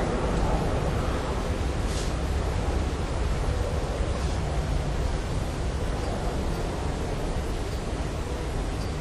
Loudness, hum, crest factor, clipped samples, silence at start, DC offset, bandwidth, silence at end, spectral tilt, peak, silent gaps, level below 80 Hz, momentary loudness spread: -29 LUFS; none; 16 dB; under 0.1%; 0 s; under 0.1%; 12.5 kHz; 0 s; -6 dB/octave; -12 dBFS; none; -30 dBFS; 4 LU